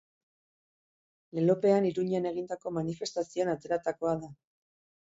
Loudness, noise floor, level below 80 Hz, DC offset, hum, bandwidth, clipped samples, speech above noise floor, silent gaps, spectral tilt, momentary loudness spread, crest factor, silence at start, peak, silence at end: -31 LUFS; under -90 dBFS; -70 dBFS; under 0.1%; none; 8 kHz; under 0.1%; over 60 dB; none; -6.5 dB/octave; 10 LU; 18 dB; 1.35 s; -12 dBFS; 0.7 s